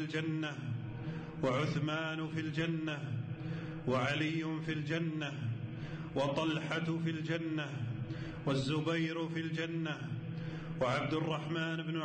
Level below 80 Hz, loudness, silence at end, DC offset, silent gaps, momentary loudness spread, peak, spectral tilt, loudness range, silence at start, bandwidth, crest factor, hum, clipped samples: -62 dBFS; -37 LUFS; 0 s; under 0.1%; none; 8 LU; -26 dBFS; -6.5 dB/octave; 1 LU; 0 s; 9 kHz; 12 dB; none; under 0.1%